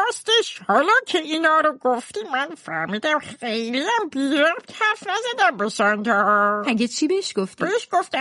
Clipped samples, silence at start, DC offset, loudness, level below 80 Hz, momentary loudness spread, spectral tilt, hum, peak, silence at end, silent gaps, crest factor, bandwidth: under 0.1%; 0 s; under 0.1%; -21 LUFS; -72 dBFS; 8 LU; -3 dB/octave; none; -6 dBFS; 0 s; none; 16 dB; 11.5 kHz